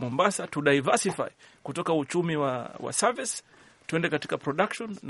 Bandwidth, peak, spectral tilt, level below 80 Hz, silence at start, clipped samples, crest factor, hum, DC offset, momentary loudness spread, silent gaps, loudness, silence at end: 11.5 kHz; -6 dBFS; -4 dB/octave; -68 dBFS; 0 s; under 0.1%; 22 dB; none; under 0.1%; 11 LU; none; -28 LUFS; 0 s